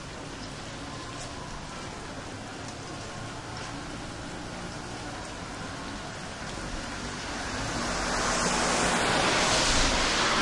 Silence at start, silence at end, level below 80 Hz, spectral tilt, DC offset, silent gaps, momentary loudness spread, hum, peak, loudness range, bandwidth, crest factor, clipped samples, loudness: 0 s; 0 s; -42 dBFS; -2.5 dB/octave; under 0.1%; none; 15 LU; none; -12 dBFS; 12 LU; 11.5 kHz; 18 dB; under 0.1%; -30 LUFS